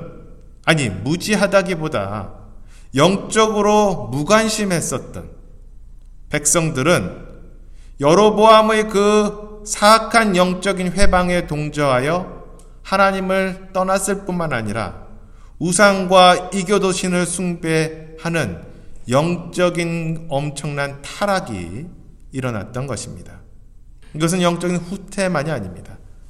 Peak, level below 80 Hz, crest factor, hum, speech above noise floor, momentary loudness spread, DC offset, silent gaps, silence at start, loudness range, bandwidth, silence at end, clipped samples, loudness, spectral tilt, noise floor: 0 dBFS; -36 dBFS; 18 dB; none; 24 dB; 16 LU; under 0.1%; none; 0 s; 9 LU; 15.5 kHz; 0 s; under 0.1%; -17 LUFS; -4.5 dB/octave; -41 dBFS